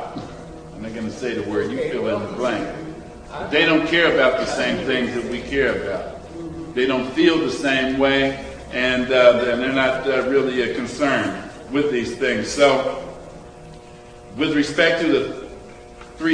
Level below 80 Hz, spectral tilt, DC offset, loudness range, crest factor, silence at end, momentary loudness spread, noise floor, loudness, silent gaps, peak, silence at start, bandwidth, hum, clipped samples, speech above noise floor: -46 dBFS; -4.5 dB/octave; under 0.1%; 5 LU; 20 dB; 0 s; 19 LU; -41 dBFS; -20 LUFS; none; 0 dBFS; 0 s; 10.5 kHz; none; under 0.1%; 22 dB